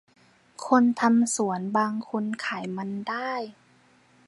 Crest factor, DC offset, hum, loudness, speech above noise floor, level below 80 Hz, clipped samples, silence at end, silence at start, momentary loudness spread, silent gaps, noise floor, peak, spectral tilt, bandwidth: 20 dB; under 0.1%; none; -26 LUFS; 35 dB; -76 dBFS; under 0.1%; 0.75 s; 0.6 s; 11 LU; none; -60 dBFS; -6 dBFS; -4.5 dB/octave; 11.5 kHz